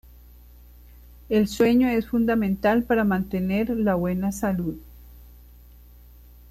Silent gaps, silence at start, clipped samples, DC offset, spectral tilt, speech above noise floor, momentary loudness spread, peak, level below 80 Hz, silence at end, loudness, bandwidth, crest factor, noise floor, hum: none; 1.3 s; under 0.1%; under 0.1%; -7 dB/octave; 26 dB; 6 LU; -10 dBFS; -46 dBFS; 1.2 s; -23 LUFS; 15 kHz; 16 dB; -48 dBFS; 60 Hz at -40 dBFS